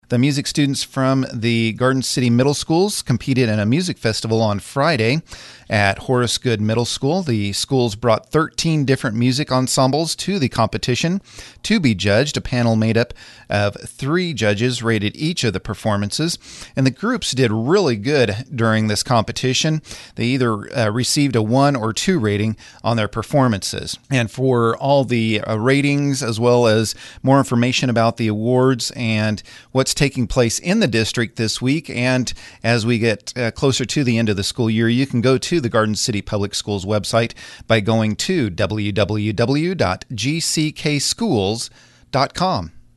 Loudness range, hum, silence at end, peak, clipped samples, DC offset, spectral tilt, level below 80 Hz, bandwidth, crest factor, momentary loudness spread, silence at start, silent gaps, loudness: 2 LU; none; 0.15 s; 0 dBFS; under 0.1%; under 0.1%; -5 dB/octave; -44 dBFS; 12 kHz; 18 dB; 6 LU; 0.1 s; none; -18 LUFS